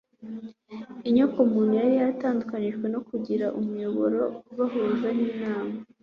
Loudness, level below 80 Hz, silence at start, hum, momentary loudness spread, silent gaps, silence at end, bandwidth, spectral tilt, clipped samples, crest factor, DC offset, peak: -26 LUFS; -68 dBFS; 0.2 s; none; 17 LU; none; 0.2 s; 5.6 kHz; -9 dB/octave; under 0.1%; 16 dB; under 0.1%; -10 dBFS